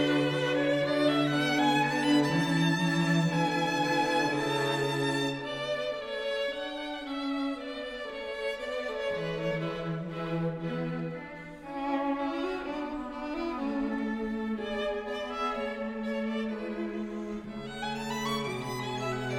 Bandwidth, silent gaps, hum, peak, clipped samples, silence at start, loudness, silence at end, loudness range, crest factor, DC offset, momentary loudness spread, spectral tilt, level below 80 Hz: 16.5 kHz; none; none; -14 dBFS; under 0.1%; 0 s; -31 LUFS; 0 s; 8 LU; 16 dB; under 0.1%; 10 LU; -5.5 dB/octave; -58 dBFS